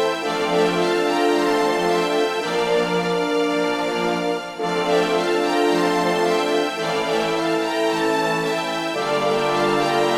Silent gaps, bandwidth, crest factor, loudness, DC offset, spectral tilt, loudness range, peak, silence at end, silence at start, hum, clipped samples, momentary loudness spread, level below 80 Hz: none; 16 kHz; 14 dB; -20 LUFS; under 0.1%; -4.5 dB/octave; 1 LU; -6 dBFS; 0 s; 0 s; none; under 0.1%; 4 LU; -56 dBFS